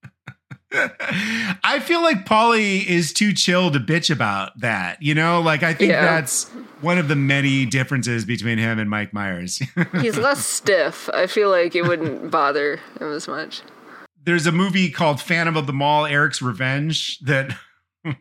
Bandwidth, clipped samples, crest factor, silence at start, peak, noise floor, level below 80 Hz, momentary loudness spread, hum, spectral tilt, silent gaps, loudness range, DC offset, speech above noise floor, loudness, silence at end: 16.5 kHz; under 0.1%; 20 dB; 0.05 s; 0 dBFS; -44 dBFS; -66 dBFS; 9 LU; none; -4.5 dB/octave; none; 4 LU; under 0.1%; 25 dB; -19 LUFS; 0.05 s